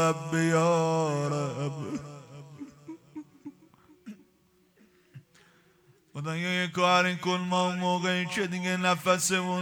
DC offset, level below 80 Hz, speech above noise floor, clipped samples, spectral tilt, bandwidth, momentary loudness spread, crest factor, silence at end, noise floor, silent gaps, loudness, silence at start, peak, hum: under 0.1%; -72 dBFS; 38 dB; under 0.1%; -4.5 dB/octave; 19 kHz; 23 LU; 18 dB; 0 s; -66 dBFS; none; -27 LUFS; 0 s; -12 dBFS; none